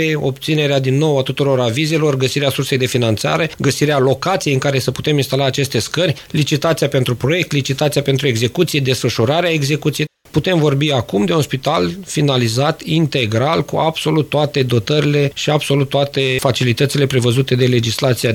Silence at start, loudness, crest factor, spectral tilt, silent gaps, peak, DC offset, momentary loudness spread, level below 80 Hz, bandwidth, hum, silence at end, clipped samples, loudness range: 0 s; -16 LUFS; 16 dB; -5.5 dB/octave; none; 0 dBFS; under 0.1%; 3 LU; -48 dBFS; 17 kHz; none; 0 s; under 0.1%; 1 LU